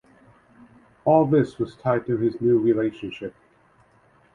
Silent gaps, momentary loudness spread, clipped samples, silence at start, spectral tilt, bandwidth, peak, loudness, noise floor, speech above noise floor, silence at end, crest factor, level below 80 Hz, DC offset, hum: none; 15 LU; under 0.1%; 1.05 s; -9.5 dB/octave; 7 kHz; -4 dBFS; -22 LUFS; -59 dBFS; 37 dB; 1.05 s; 20 dB; -60 dBFS; under 0.1%; none